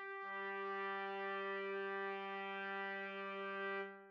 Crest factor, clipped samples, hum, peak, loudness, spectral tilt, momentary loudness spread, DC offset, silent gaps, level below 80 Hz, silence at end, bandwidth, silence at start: 12 dB; under 0.1%; none; -32 dBFS; -44 LUFS; -1.5 dB/octave; 2 LU; under 0.1%; none; under -90 dBFS; 0 s; 6.6 kHz; 0 s